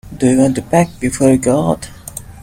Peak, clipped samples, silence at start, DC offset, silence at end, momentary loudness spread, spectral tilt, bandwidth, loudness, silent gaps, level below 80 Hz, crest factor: 0 dBFS; under 0.1%; 0.05 s; under 0.1%; 0.05 s; 16 LU; -6.5 dB/octave; 16.5 kHz; -14 LUFS; none; -40 dBFS; 14 dB